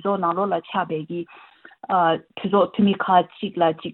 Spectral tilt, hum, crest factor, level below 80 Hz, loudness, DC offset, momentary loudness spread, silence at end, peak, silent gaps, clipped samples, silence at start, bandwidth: -10.5 dB/octave; none; 18 dB; -66 dBFS; -22 LUFS; under 0.1%; 12 LU; 0 s; -4 dBFS; none; under 0.1%; 0.05 s; 4.2 kHz